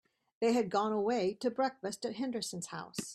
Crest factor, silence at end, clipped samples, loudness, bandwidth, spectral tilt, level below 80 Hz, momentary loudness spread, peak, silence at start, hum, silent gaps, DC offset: 16 dB; 0 s; under 0.1%; -34 LUFS; 14 kHz; -4.5 dB/octave; -76 dBFS; 9 LU; -18 dBFS; 0.4 s; none; none; under 0.1%